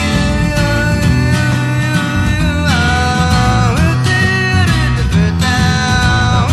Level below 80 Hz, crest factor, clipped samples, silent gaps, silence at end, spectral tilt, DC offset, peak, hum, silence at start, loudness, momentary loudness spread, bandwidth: -22 dBFS; 12 dB; under 0.1%; none; 0 s; -5.5 dB/octave; under 0.1%; 0 dBFS; none; 0 s; -12 LUFS; 2 LU; 14 kHz